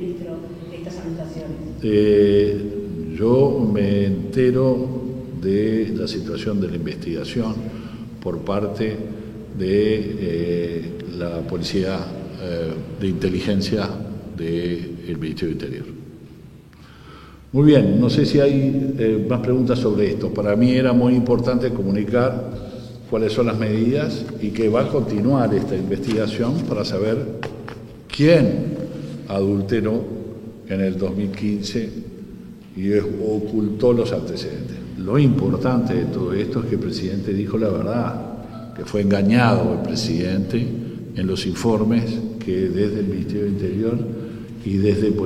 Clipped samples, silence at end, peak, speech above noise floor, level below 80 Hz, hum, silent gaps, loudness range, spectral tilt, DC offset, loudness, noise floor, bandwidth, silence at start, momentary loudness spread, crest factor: under 0.1%; 0 s; 0 dBFS; 24 dB; -46 dBFS; none; none; 6 LU; -7.5 dB/octave; under 0.1%; -21 LUFS; -44 dBFS; 13.5 kHz; 0 s; 15 LU; 20 dB